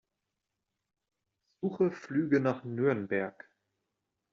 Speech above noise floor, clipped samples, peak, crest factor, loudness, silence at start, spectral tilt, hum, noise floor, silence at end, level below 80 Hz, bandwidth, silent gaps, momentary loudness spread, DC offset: 56 dB; under 0.1%; -14 dBFS; 20 dB; -31 LUFS; 1.6 s; -7.5 dB/octave; none; -86 dBFS; 1 s; -76 dBFS; 7.2 kHz; none; 9 LU; under 0.1%